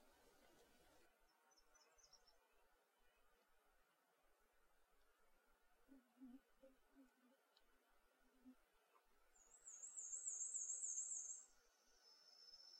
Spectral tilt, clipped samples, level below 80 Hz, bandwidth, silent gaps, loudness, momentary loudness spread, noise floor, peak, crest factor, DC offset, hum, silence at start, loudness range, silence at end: 1 dB/octave; under 0.1%; -88 dBFS; 16 kHz; none; -49 LUFS; 21 LU; -81 dBFS; -36 dBFS; 24 dB; under 0.1%; none; 0 s; 11 LU; 0 s